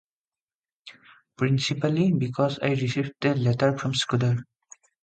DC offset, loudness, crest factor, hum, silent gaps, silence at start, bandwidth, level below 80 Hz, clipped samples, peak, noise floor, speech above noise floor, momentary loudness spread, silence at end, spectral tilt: under 0.1%; -25 LUFS; 18 dB; none; none; 0.85 s; 9.2 kHz; -60 dBFS; under 0.1%; -8 dBFS; under -90 dBFS; over 66 dB; 4 LU; 0.6 s; -6 dB/octave